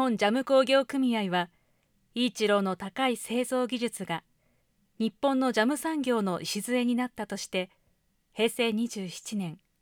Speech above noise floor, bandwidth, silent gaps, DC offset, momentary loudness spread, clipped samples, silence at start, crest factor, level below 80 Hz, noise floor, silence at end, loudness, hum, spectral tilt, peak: 43 dB; 19 kHz; none; under 0.1%; 11 LU; under 0.1%; 0 s; 18 dB; -72 dBFS; -71 dBFS; 0.25 s; -28 LUFS; none; -4.5 dB/octave; -12 dBFS